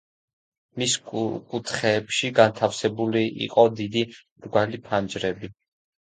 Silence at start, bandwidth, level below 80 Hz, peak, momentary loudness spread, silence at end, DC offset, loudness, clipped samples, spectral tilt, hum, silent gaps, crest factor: 0.75 s; 9.6 kHz; -60 dBFS; -2 dBFS; 11 LU; 0.5 s; under 0.1%; -24 LUFS; under 0.1%; -4 dB/octave; none; 4.31-4.36 s; 22 dB